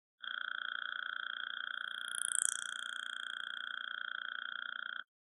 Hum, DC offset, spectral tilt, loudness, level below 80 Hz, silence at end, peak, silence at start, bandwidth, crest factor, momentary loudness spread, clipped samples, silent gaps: none; under 0.1%; 4.5 dB/octave; -39 LUFS; under -90 dBFS; 0.35 s; -8 dBFS; 0.2 s; 12 kHz; 34 dB; 8 LU; under 0.1%; none